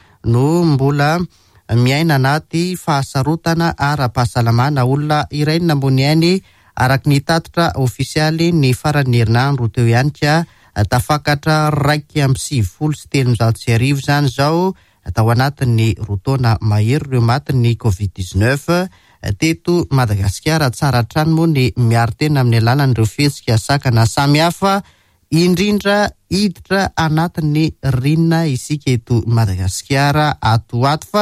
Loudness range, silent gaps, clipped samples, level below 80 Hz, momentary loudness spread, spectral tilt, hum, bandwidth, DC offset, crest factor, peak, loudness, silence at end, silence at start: 2 LU; none; under 0.1%; -38 dBFS; 5 LU; -6 dB/octave; none; 15 kHz; under 0.1%; 12 dB; -4 dBFS; -15 LUFS; 0 s; 0.25 s